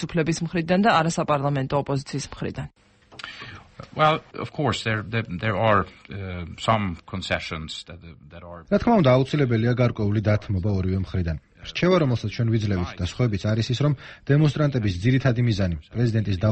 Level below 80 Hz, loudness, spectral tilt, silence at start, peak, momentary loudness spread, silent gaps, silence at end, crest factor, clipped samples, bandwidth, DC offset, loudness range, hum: -44 dBFS; -23 LUFS; -6.5 dB/octave; 0 s; -6 dBFS; 16 LU; none; 0 s; 16 dB; under 0.1%; 8.4 kHz; under 0.1%; 5 LU; none